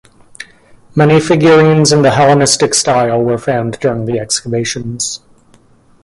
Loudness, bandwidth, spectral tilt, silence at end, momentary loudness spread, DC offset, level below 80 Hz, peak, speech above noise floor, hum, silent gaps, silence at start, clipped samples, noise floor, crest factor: -11 LUFS; 11.5 kHz; -4.5 dB/octave; 0.85 s; 12 LU; under 0.1%; -46 dBFS; 0 dBFS; 36 dB; none; none; 0.4 s; under 0.1%; -47 dBFS; 12 dB